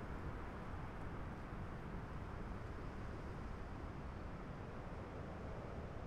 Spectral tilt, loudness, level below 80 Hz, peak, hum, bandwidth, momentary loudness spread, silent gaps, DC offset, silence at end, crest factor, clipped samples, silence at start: -7.5 dB/octave; -50 LUFS; -52 dBFS; -34 dBFS; none; 13 kHz; 1 LU; none; under 0.1%; 0 s; 12 dB; under 0.1%; 0 s